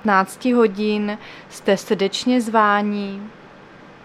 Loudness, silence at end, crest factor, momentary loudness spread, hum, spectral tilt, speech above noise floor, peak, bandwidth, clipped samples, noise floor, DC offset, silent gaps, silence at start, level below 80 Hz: -19 LUFS; 0.15 s; 18 dB; 16 LU; none; -5 dB/octave; 24 dB; -2 dBFS; 14.5 kHz; under 0.1%; -43 dBFS; under 0.1%; none; 0.05 s; -62 dBFS